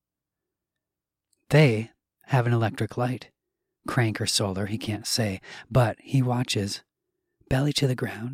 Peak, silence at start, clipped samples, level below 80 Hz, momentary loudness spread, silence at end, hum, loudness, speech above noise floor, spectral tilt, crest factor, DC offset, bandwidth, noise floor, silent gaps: -6 dBFS; 1.5 s; under 0.1%; -52 dBFS; 9 LU; 0 s; none; -25 LUFS; 64 dB; -5 dB/octave; 20 dB; under 0.1%; 16 kHz; -88 dBFS; none